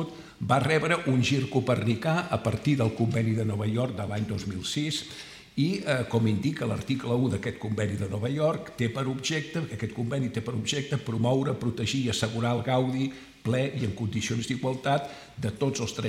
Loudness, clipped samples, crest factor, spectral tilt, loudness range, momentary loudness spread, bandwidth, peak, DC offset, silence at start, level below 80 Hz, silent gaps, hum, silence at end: -28 LUFS; under 0.1%; 18 dB; -5.5 dB/octave; 3 LU; 7 LU; 14.5 kHz; -10 dBFS; under 0.1%; 0 s; -60 dBFS; none; none; 0 s